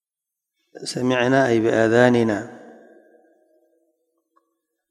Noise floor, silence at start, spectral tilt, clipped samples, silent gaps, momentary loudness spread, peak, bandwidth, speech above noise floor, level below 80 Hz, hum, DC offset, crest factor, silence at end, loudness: -86 dBFS; 0.75 s; -6 dB/octave; under 0.1%; none; 15 LU; 0 dBFS; 12 kHz; 68 dB; -62 dBFS; none; under 0.1%; 22 dB; 2.2 s; -19 LUFS